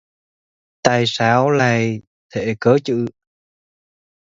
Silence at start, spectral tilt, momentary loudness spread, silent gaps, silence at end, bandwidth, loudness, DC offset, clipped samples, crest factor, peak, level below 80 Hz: 0.85 s; -5.5 dB/octave; 12 LU; 2.07-2.29 s; 1.2 s; 7.8 kHz; -17 LUFS; under 0.1%; under 0.1%; 20 dB; 0 dBFS; -56 dBFS